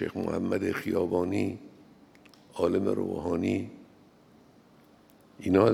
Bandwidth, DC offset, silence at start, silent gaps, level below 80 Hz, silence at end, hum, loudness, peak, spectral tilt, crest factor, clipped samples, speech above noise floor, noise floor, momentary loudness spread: 15.5 kHz; under 0.1%; 0 s; none; -64 dBFS; 0 s; none; -29 LUFS; -8 dBFS; -7.5 dB/octave; 22 dB; under 0.1%; 31 dB; -58 dBFS; 10 LU